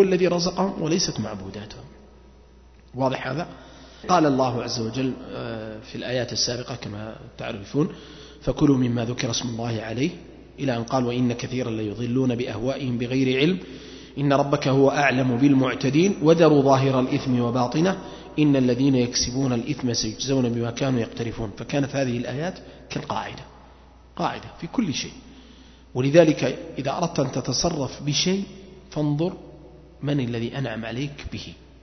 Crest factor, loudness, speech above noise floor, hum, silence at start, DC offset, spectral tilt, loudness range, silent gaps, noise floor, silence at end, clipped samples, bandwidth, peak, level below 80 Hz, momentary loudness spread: 22 dB; -23 LUFS; 27 dB; none; 0 s; under 0.1%; -5.5 dB/octave; 9 LU; none; -50 dBFS; 0.3 s; under 0.1%; 6.4 kHz; -2 dBFS; -48 dBFS; 16 LU